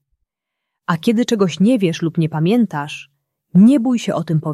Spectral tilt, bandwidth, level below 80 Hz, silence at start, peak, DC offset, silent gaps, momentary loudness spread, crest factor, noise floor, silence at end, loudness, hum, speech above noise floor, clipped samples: -7 dB/octave; 13 kHz; -62 dBFS; 0.9 s; -2 dBFS; under 0.1%; none; 13 LU; 14 dB; -80 dBFS; 0 s; -16 LUFS; none; 65 dB; under 0.1%